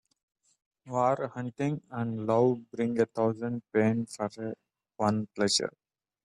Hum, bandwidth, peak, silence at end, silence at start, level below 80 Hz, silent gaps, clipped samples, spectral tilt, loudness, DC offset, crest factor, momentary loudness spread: none; 12 kHz; -12 dBFS; 0.55 s; 0.85 s; -72 dBFS; none; under 0.1%; -5 dB/octave; -30 LUFS; under 0.1%; 18 dB; 9 LU